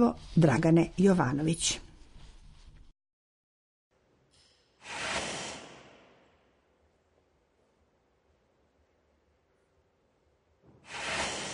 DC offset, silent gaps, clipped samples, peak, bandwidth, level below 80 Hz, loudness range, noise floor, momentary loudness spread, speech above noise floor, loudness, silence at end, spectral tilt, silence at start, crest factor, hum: under 0.1%; 3.13-3.91 s; under 0.1%; -12 dBFS; 10.5 kHz; -56 dBFS; 18 LU; -71 dBFS; 18 LU; 45 dB; -28 LUFS; 0 s; -5 dB/octave; 0 s; 22 dB; none